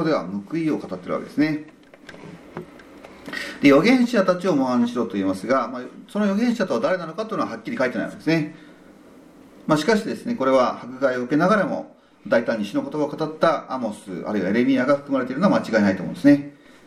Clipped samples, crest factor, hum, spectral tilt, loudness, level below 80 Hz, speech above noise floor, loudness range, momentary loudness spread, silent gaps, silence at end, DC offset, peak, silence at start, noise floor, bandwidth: under 0.1%; 18 dB; none; -6.5 dB/octave; -22 LUFS; -64 dBFS; 26 dB; 5 LU; 14 LU; none; 0.35 s; under 0.1%; -4 dBFS; 0 s; -47 dBFS; 14 kHz